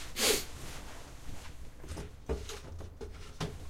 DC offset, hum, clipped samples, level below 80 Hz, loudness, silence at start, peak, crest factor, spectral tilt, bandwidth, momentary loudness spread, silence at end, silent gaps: under 0.1%; none; under 0.1%; -46 dBFS; -37 LUFS; 0 s; -14 dBFS; 24 dB; -2.5 dB/octave; 16 kHz; 20 LU; 0 s; none